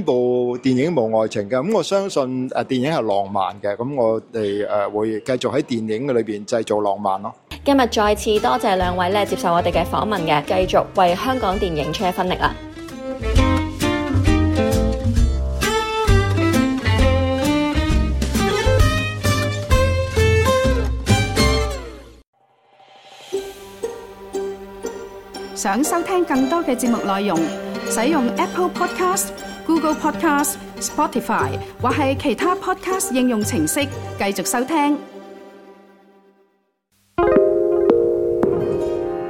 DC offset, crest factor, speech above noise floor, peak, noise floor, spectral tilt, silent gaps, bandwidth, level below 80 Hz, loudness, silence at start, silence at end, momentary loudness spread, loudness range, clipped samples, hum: under 0.1%; 18 dB; 46 dB; -2 dBFS; -65 dBFS; -5 dB/octave; 22.27-22.33 s; 17 kHz; -30 dBFS; -19 LUFS; 0 s; 0 s; 10 LU; 5 LU; under 0.1%; none